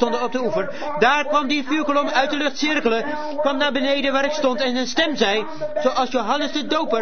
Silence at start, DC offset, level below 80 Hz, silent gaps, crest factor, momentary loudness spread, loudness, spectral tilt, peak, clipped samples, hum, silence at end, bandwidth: 0 s; 3%; -54 dBFS; none; 18 dB; 5 LU; -20 LUFS; -3 dB/octave; -2 dBFS; under 0.1%; none; 0 s; 6.6 kHz